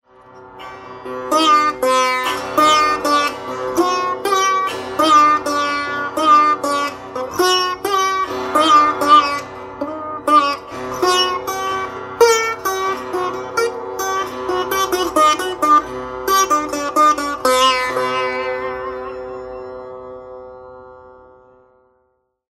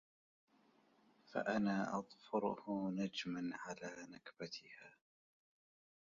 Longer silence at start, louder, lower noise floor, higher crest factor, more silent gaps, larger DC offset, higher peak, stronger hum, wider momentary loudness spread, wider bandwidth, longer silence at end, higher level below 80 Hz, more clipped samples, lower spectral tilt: second, 0.35 s vs 1.3 s; first, -16 LUFS vs -43 LUFS; second, -66 dBFS vs -73 dBFS; about the same, 18 dB vs 20 dB; neither; neither; first, 0 dBFS vs -26 dBFS; neither; about the same, 17 LU vs 16 LU; first, 16 kHz vs 7.4 kHz; first, 1.35 s vs 1.2 s; first, -52 dBFS vs -80 dBFS; neither; second, -2 dB/octave vs -4.5 dB/octave